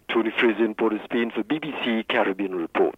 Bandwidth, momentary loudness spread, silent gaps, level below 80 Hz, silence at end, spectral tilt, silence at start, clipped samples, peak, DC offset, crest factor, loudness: 4.7 kHz; 6 LU; none; -66 dBFS; 0.05 s; -6.5 dB/octave; 0.1 s; under 0.1%; -8 dBFS; under 0.1%; 16 dB; -24 LUFS